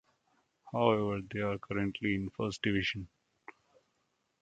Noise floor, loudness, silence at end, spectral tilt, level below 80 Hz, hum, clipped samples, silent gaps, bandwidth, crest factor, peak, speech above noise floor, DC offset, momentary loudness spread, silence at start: -79 dBFS; -34 LUFS; 1.35 s; -6 dB/octave; -60 dBFS; none; under 0.1%; none; 9 kHz; 26 dB; -10 dBFS; 46 dB; under 0.1%; 9 LU; 0.65 s